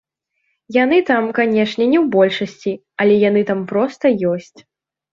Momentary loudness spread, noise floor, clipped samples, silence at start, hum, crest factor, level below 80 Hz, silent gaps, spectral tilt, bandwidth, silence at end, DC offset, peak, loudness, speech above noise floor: 8 LU; -70 dBFS; under 0.1%; 0.7 s; none; 14 dB; -62 dBFS; none; -7 dB/octave; 7.4 kHz; 0.7 s; under 0.1%; -2 dBFS; -16 LUFS; 54 dB